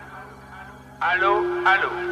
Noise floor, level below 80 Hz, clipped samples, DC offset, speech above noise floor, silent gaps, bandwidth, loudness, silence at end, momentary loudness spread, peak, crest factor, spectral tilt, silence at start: -42 dBFS; -54 dBFS; under 0.1%; under 0.1%; 21 dB; none; 11 kHz; -20 LUFS; 0 s; 22 LU; -6 dBFS; 18 dB; -5 dB/octave; 0 s